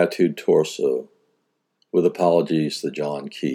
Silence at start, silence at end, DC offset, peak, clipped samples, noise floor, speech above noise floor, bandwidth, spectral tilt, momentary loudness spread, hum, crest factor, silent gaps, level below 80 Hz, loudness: 0 s; 0 s; under 0.1%; -4 dBFS; under 0.1%; -72 dBFS; 51 dB; 16.5 kHz; -6 dB/octave; 9 LU; none; 18 dB; none; -82 dBFS; -22 LUFS